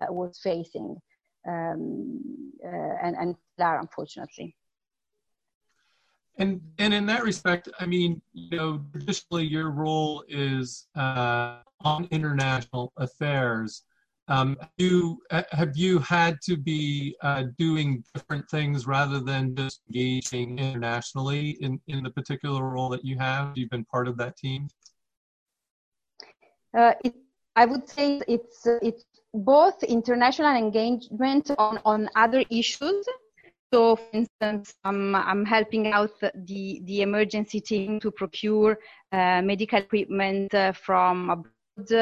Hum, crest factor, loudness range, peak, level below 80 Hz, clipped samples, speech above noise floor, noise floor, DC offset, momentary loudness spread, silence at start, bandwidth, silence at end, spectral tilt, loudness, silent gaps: none; 22 dB; 9 LU; -6 dBFS; -62 dBFS; under 0.1%; 60 dB; -86 dBFS; under 0.1%; 12 LU; 0 s; 9.4 kHz; 0 s; -6 dB/octave; -26 LUFS; 5.55-5.61 s, 11.74-11.78 s, 14.22-14.26 s, 25.17-25.46 s, 25.71-25.92 s, 33.59-33.70 s, 34.30-34.39 s